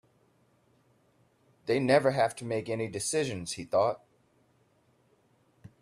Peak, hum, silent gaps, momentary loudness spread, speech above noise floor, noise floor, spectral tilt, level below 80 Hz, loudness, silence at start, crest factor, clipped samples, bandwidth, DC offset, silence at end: -10 dBFS; none; none; 11 LU; 40 dB; -68 dBFS; -4.5 dB/octave; -70 dBFS; -29 LUFS; 1.65 s; 22 dB; under 0.1%; 14.5 kHz; under 0.1%; 1.85 s